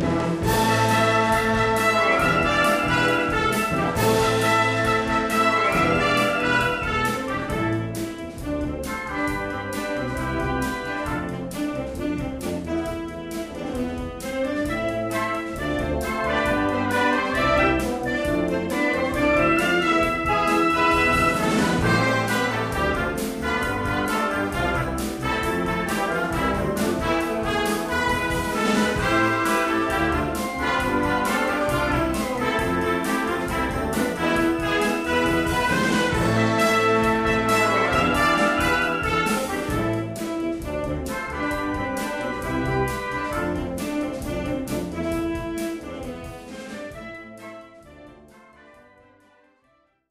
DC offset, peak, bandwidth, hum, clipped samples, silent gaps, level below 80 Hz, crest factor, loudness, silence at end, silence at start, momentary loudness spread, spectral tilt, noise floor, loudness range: under 0.1%; -6 dBFS; 15.5 kHz; none; under 0.1%; none; -38 dBFS; 16 dB; -22 LUFS; 1.9 s; 0 s; 9 LU; -5 dB/octave; -64 dBFS; 8 LU